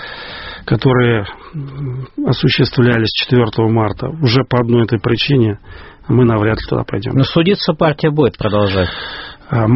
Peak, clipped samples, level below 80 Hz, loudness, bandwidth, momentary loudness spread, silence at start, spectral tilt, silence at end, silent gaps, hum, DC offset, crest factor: 0 dBFS; under 0.1%; -38 dBFS; -14 LUFS; 6 kHz; 14 LU; 0 s; -5.5 dB/octave; 0 s; none; none; under 0.1%; 14 dB